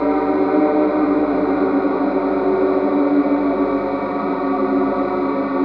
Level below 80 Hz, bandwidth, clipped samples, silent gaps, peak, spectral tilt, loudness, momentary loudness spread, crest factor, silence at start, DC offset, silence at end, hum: -48 dBFS; 5.2 kHz; under 0.1%; none; -6 dBFS; -9.5 dB/octave; -18 LUFS; 4 LU; 12 dB; 0 s; under 0.1%; 0 s; 50 Hz at -40 dBFS